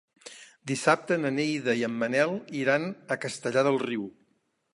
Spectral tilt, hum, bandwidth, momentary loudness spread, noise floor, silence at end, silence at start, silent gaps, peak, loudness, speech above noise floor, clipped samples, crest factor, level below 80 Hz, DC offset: -5 dB/octave; none; 11.5 kHz; 17 LU; -72 dBFS; 0.65 s; 0.25 s; none; -6 dBFS; -27 LUFS; 45 dB; under 0.1%; 22 dB; -78 dBFS; under 0.1%